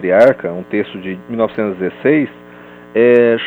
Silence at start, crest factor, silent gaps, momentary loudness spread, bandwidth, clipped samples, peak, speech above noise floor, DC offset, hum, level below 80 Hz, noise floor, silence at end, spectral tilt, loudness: 0 s; 14 dB; none; 13 LU; 6.4 kHz; under 0.1%; 0 dBFS; 24 dB; under 0.1%; 60 Hz at -40 dBFS; -58 dBFS; -37 dBFS; 0 s; -8 dB/octave; -15 LUFS